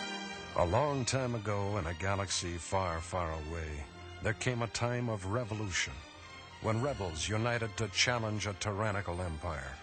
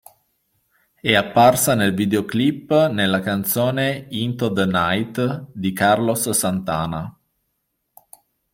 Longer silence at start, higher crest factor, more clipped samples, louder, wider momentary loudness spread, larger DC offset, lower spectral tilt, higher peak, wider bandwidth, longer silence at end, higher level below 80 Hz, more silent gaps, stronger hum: second, 0 s vs 1.05 s; about the same, 20 dB vs 18 dB; neither; second, -35 LUFS vs -19 LUFS; about the same, 10 LU vs 10 LU; neither; about the same, -4 dB/octave vs -4.5 dB/octave; second, -14 dBFS vs -2 dBFS; second, 8.8 kHz vs 16.5 kHz; second, 0 s vs 1.4 s; about the same, -52 dBFS vs -54 dBFS; neither; neither